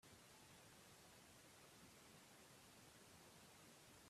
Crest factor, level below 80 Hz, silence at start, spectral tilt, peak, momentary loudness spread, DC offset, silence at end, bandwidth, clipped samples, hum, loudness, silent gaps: 14 dB; -86 dBFS; 0 s; -2.5 dB/octave; -54 dBFS; 0 LU; under 0.1%; 0 s; 15.5 kHz; under 0.1%; none; -65 LUFS; none